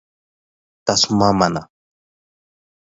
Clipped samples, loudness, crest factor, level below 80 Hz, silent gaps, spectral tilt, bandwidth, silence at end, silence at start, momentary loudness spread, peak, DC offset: under 0.1%; -17 LUFS; 22 dB; -48 dBFS; none; -4 dB/octave; 8 kHz; 1.35 s; 0.85 s; 11 LU; 0 dBFS; under 0.1%